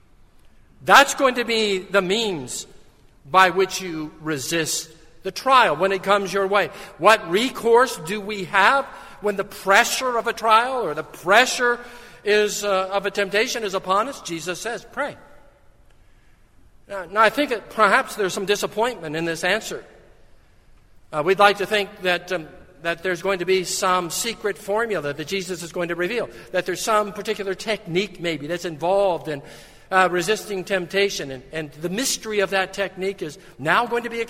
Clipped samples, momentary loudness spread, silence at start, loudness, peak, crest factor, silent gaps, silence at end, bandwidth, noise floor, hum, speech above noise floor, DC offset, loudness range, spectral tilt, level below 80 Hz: under 0.1%; 13 LU; 0.45 s; -21 LUFS; 0 dBFS; 22 dB; none; 0 s; 16 kHz; -52 dBFS; none; 31 dB; under 0.1%; 6 LU; -3 dB/octave; -54 dBFS